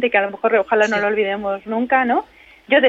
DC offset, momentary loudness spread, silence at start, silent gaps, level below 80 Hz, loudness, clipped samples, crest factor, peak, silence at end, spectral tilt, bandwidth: under 0.1%; 6 LU; 0 s; none; -58 dBFS; -18 LUFS; under 0.1%; 16 dB; -2 dBFS; 0 s; -4.5 dB/octave; 8 kHz